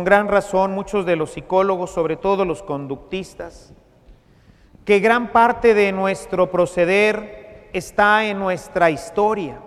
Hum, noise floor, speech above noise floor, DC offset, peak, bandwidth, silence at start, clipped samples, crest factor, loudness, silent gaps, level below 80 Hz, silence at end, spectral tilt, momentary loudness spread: none; -51 dBFS; 33 dB; under 0.1%; 0 dBFS; 14 kHz; 0 s; under 0.1%; 18 dB; -18 LUFS; none; -48 dBFS; 0 s; -5.5 dB/octave; 14 LU